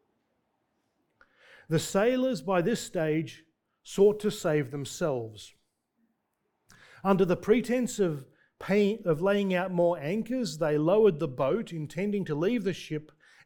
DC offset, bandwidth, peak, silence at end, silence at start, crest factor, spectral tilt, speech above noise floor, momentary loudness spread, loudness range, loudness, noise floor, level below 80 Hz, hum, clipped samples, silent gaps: under 0.1%; 19 kHz; -10 dBFS; 0.4 s; 1.7 s; 20 dB; -6 dB/octave; 51 dB; 11 LU; 4 LU; -28 LUFS; -79 dBFS; -62 dBFS; none; under 0.1%; none